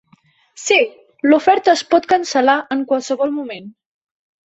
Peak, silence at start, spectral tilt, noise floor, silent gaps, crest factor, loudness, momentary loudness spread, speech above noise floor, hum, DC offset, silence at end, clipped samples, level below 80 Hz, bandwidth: 0 dBFS; 0.6 s; -2.5 dB/octave; -55 dBFS; none; 16 dB; -16 LUFS; 12 LU; 39 dB; none; under 0.1%; 0.8 s; under 0.1%; -62 dBFS; 8.2 kHz